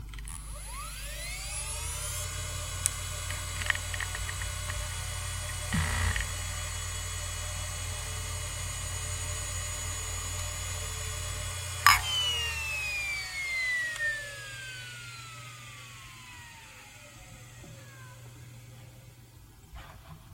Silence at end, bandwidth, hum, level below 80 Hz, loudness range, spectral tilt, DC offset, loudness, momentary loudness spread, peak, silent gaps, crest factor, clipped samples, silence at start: 0 s; 16.5 kHz; none; -44 dBFS; 19 LU; -1.5 dB/octave; under 0.1%; -32 LUFS; 19 LU; -2 dBFS; none; 34 dB; under 0.1%; 0 s